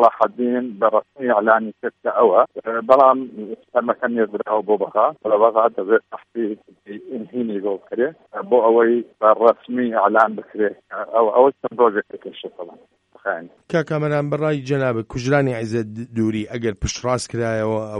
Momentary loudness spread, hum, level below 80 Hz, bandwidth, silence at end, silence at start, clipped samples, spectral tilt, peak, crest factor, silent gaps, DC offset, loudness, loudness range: 15 LU; none; -48 dBFS; 11 kHz; 0 s; 0 s; under 0.1%; -6.5 dB/octave; 0 dBFS; 18 dB; none; under 0.1%; -19 LUFS; 5 LU